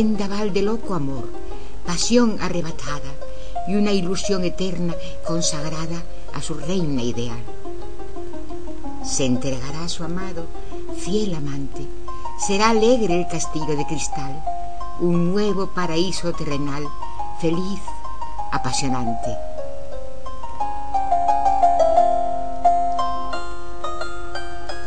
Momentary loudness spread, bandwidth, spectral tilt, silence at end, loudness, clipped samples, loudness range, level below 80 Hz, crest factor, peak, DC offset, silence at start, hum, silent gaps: 17 LU; 10.5 kHz; -5 dB/octave; 0 s; -23 LUFS; under 0.1%; 7 LU; -38 dBFS; 20 dB; -2 dBFS; 10%; 0 s; none; none